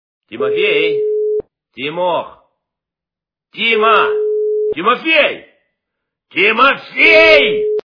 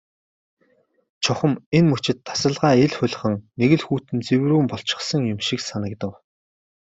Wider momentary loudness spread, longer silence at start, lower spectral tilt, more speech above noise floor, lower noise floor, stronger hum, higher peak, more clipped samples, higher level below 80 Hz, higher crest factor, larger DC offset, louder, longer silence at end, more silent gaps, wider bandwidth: first, 14 LU vs 8 LU; second, 0.3 s vs 1.2 s; about the same, -4.5 dB/octave vs -5.5 dB/octave; first, 74 dB vs 43 dB; first, -86 dBFS vs -63 dBFS; neither; first, 0 dBFS vs -4 dBFS; first, 0.1% vs under 0.1%; about the same, -54 dBFS vs -58 dBFS; about the same, 14 dB vs 18 dB; neither; first, -12 LUFS vs -21 LUFS; second, 0.05 s vs 0.85 s; second, none vs 1.66-1.72 s; second, 5.4 kHz vs 8 kHz